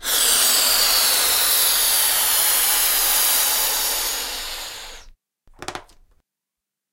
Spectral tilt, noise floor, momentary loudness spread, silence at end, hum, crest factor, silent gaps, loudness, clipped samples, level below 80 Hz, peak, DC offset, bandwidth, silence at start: 2.5 dB/octave; -85 dBFS; 18 LU; 1.1 s; none; 16 dB; none; -15 LUFS; under 0.1%; -46 dBFS; -4 dBFS; under 0.1%; 16 kHz; 0 s